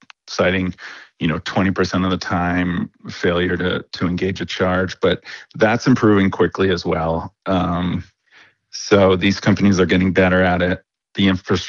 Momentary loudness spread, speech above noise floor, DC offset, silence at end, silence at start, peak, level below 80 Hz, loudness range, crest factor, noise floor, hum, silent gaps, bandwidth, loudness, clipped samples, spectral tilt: 11 LU; 34 dB; under 0.1%; 0 s; 0.25 s; -4 dBFS; -46 dBFS; 4 LU; 14 dB; -52 dBFS; none; none; 7.2 kHz; -18 LUFS; under 0.1%; -6 dB/octave